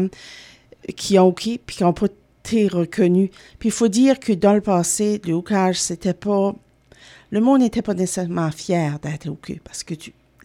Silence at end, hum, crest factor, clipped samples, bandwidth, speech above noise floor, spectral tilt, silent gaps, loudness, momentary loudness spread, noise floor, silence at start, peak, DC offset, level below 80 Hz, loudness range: 0.35 s; none; 18 dB; under 0.1%; 16 kHz; 29 dB; -5.5 dB/octave; none; -20 LUFS; 16 LU; -48 dBFS; 0 s; -2 dBFS; under 0.1%; -52 dBFS; 3 LU